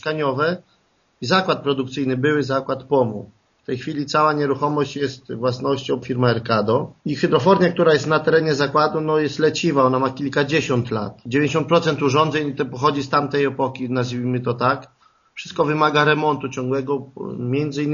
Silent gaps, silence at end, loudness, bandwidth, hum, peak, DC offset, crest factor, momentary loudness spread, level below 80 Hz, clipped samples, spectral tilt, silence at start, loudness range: none; 0 s; -20 LUFS; 7.4 kHz; none; -2 dBFS; under 0.1%; 18 dB; 10 LU; -58 dBFS; under 0.1%; -4.5 dB/octave; 0.05 s; 4 LU